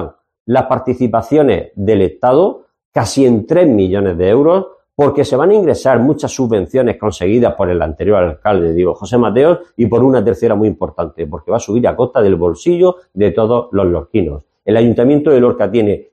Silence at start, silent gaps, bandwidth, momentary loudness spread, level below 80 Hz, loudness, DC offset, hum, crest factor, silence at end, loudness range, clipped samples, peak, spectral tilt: 0 s; 0.40-0.45 s, 2.85-2.92 s; 9.8 kHz; 7 LU; -38 dBFS; -13 LUFS; under 0.1%; none; 12 dB; 0.1 s; 2 LU; under 0.1%; 0 dBFS; -7 dB/octave